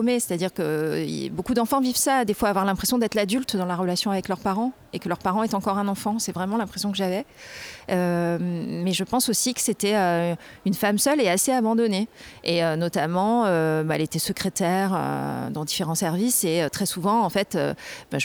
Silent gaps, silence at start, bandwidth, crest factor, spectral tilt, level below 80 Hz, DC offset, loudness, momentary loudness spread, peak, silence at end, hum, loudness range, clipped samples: none; 0 s; over 20 kHz; 18 dB; -4 dB/octave; -56 dBFS; under 0.1%; -24 LUFS; 8 LU; -6 dBFS; 0 s; none; 4 LU; under 0.1%